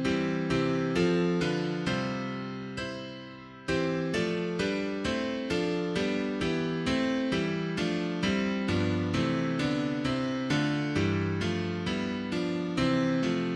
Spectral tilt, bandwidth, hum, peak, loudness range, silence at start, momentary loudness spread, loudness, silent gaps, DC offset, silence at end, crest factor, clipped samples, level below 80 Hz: -6 dB/octave; 11 kHz; none; -14 dBFS; 3 LU; 0 s; 6 LU; -30 LUFS; none; under 0.1%; 0 s; 14 dB; under 0.1%; -54 dBFS